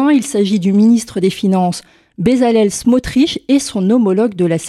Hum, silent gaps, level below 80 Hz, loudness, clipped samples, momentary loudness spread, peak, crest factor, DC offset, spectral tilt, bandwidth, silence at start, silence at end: none; none; -42 dBFS; -13 LUFS; under 0.1%; 4 LU; 0 dBFS; 12 dB; under 0.1%; -6 dB/octave; 13.5 kHz; 0 s; 0 s